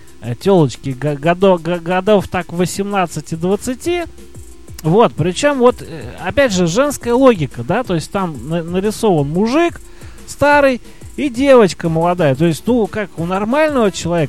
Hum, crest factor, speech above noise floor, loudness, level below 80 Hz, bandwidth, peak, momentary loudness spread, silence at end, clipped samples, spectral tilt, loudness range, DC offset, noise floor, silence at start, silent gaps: none; 14 dB; 20 dB; -15 LUFS; -40 dBFS; 15 kHz; 0 dBFS; 10 LU; 0 s; under 0.1%; -6 dB/octave; 3 LU; 2%; -35 dBFS; 0.2 s; none